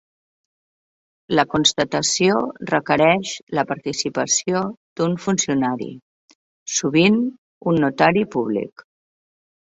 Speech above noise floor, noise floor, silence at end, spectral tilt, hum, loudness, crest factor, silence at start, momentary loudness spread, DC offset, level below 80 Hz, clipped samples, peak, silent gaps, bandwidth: over 71 dB; under -90 dBFS; 0.8 s; -3.5 dB/octave; none; -20 LUFS; 20 dB; 1.3 s; 10 LU; under 0.1%; -58 dBFS; under 0.1%; -2 dBFS; 3.43-3.47 s, 4.77-4.96 s, 6.02-6.28 s, 6.35-6.66 s, 7.38-7.61 s; 8.2 kHz